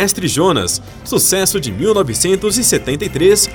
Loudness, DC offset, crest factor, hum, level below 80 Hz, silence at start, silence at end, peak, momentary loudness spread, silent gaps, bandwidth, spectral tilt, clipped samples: -14 LUFS; under 0.1%; 14 dB; none; -38 dBFS; 0 s; 0 s; -2 dBFS; 7 LU; none; over 20 kHz; -3 dB/octave; under 0.1%